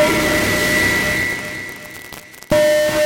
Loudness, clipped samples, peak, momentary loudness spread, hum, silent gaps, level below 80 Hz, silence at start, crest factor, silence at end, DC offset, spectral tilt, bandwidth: -16 LUFS; under 0.1%; -4 dBFS; 18 LU; none; none; -38 dBFS; 0 s; 12 dB; 0 s; under 0.1%; -3.5 dB/octave; 17 kHz